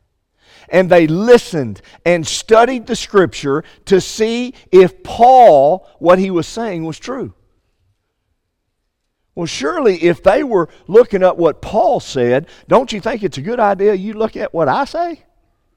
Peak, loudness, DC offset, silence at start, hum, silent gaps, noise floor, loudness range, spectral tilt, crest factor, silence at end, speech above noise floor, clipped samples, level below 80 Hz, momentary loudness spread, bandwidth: 0 dBFS; -14 LUFS; under 0.1%; 0.7 s; none; none; -70 dBFS; 8 LU; -5.5 dB/octave; 14 dB; 0.6 s; 57 dB; under 0.1%; -44 dBFS; 12 LU; 14.5 kHz